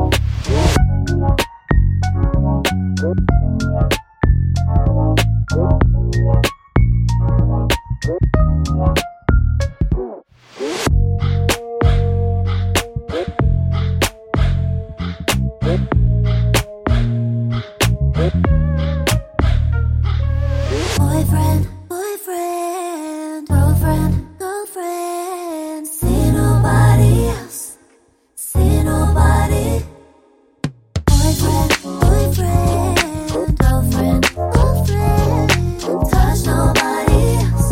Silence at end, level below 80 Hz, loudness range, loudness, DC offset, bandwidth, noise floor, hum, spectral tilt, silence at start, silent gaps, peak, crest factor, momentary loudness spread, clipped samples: 0 s; -20 dBFS; 3 LU; -17 LUFS; under 0.1%; 16.5 kHz; -54 dBFS; none; -6 dB/octave; 0 s; none; 0 dBFS; 14 dB; 9 LU; under 0.1%